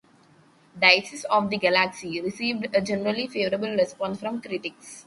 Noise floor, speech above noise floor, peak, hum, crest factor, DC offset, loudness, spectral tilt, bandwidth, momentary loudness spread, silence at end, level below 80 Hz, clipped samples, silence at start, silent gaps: -57 dBFS; 32 dB; -2 dBFS; none; 24 dB; under 0.1%; -24 LUFS; -4 dB/octave; 11.5 kHz; 13 LU; 0.05 s; -64 dBFS; under 0.1%; 0.75 s; none